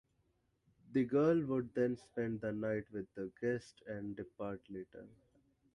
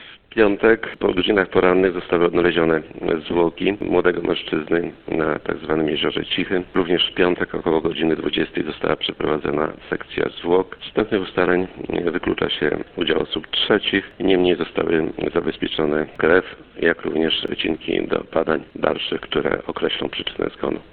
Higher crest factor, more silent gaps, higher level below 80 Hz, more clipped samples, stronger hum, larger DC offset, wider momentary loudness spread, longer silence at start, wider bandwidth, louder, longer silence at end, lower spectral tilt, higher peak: about the same, 18 dB vs 20 dB; neither; second, -70 dBFS vs -46 dBFS; neither; neither; neither; first, 16 LU vs 7 LU; first, 0.9 s vs 0 s; first, 11 kHz vs 4.5 kHz; second, -38 LUFS vs -21 LUFS; first, 0.65 s vs 0.1 s; about the same, -8.5 dB/octave vs -9 dB/octave; second, -22 dBFS vs 0 dBFS